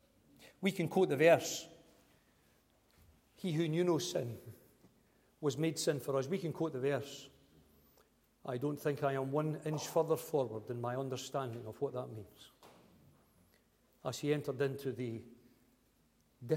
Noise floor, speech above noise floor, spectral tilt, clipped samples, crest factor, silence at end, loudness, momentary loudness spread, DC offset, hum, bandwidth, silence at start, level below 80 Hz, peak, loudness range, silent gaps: -72 dBFS; 37 dB; -5.5 dB/octave; under 0.1%; 24 dB; 0 s; -36 LUFS; 15 LU; under 0.1%; none; 16.5 kHz; 0.4 s; -76 dBFS; -14 dBFS; 7 LU; none